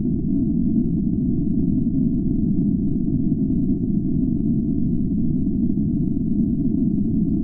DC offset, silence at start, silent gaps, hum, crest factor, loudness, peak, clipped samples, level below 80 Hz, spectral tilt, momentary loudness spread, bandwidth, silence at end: under 0.1%; 0 s; none; none; 12 dB; -21 LUFS; -8 dBFS; under 0.1%; -32 dBFS; -16 dB/octave; 1 LU; 1.1 kHz; 0 s